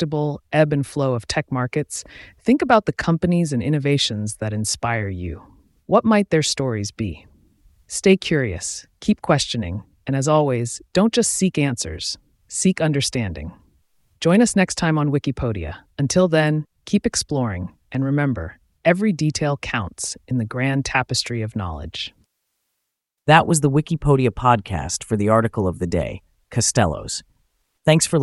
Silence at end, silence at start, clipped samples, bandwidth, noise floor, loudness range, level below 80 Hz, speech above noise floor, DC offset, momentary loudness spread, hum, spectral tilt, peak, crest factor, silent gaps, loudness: 0 s; 0 s; under 0.1%; 12 kHz; -79 dBFS; 3 LU; -44 dBFS; 59 dB; under 0.1%; 13 LU; none; -5 dB/octave; 0 dBFS; 20 dB; none; -20 LUFS